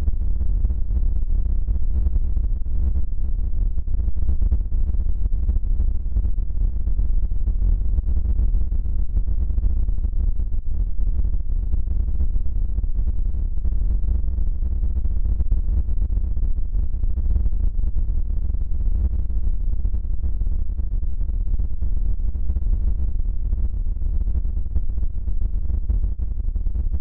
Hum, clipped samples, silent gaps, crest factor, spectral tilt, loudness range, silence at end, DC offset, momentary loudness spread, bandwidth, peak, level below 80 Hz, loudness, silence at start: none; under 0.1%; none; 12 dB; -12.5 dB/octave; 2 LU; 0 s; under 0.1%; 3 LU; 1.2 kHz; -8 dBFS; -20 dBFS; -26 LUFS; 0 s